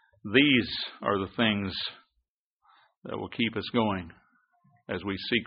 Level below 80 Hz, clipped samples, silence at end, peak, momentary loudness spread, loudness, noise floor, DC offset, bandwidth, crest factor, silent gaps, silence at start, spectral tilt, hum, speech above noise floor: -62 dBFS; under 0.1%; 0 s; -8 dBFS; 15 LU; -28 LUFS; -80 dBFS; under 0.1%; 5.2 kHz; 22 dB; 2.28-2.60 s, 2.97-3.02 s; 0.25 s; -3 dB/octave; none; 52 dB